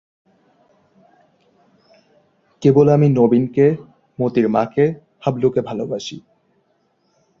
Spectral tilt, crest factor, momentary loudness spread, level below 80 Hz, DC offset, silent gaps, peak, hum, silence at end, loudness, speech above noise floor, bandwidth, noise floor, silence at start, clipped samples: -8.5 dB/octave; 18 dB; 15 LU; -58 dBFS; under 0.1%; none; -2 dBFS; none; 1.2 s; -17 LUFS; 48 dB; 7.4 kHz; -64 dBFS; 2.6 s; under 0.1%